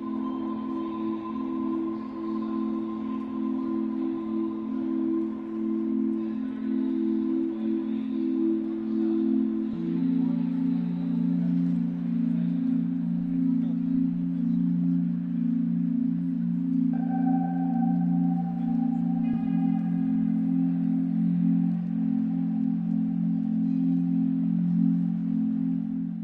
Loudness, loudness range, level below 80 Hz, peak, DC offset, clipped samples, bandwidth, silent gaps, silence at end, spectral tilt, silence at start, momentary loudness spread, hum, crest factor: -27 LUFS; 4 LU; -62 dBFS; -14 dBFS; under 0.1%; under 0.1%; 4.1 kHz; none; 0 s; -11.5 dB/octave; 0 s; 6 LU; none; 12 dB